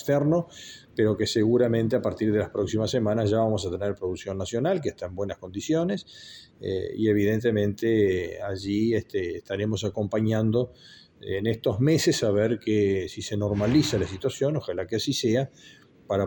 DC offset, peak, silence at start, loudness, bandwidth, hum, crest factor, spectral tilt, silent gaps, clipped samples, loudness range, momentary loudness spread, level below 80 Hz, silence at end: under 0.1%; -10 dBFS; 0 s; -26 LUFS; 17.5 kHz; none; 16 dB; -6 dB/octave; none; under 0.1%; 3 LU; 10 LU; -56 dBFS; 0 s